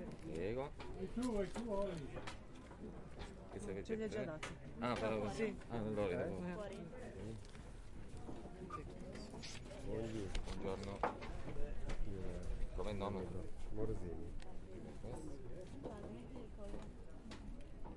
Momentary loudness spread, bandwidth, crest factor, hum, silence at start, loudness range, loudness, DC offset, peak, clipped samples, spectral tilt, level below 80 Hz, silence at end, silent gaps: 13 LU; 11.5 kHz; 20 dB; none; 0 s; 8 LU; -47 LUFS; under 0.1%; -24 dBFS; under 0.1%; -6 dB/octave; -50 dBFS; 0 s; none